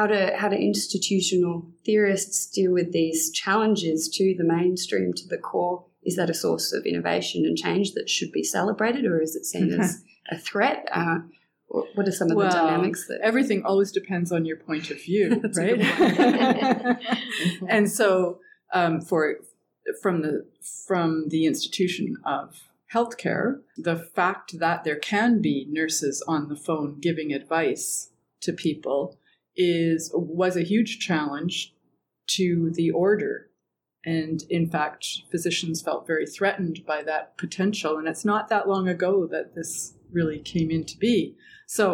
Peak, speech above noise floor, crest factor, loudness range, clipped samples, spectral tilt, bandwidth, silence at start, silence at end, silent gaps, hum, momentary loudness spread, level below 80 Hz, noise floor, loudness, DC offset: -8 dBFS; 56 dB; 16 dB; 4 LU; under 0.1%; -4.5 dB/octave; 18 kHz; 0 s; 0 s; none; none; 9 LU; -66 dBFS; -81 dBFS; -25 LUFS; under 0.1%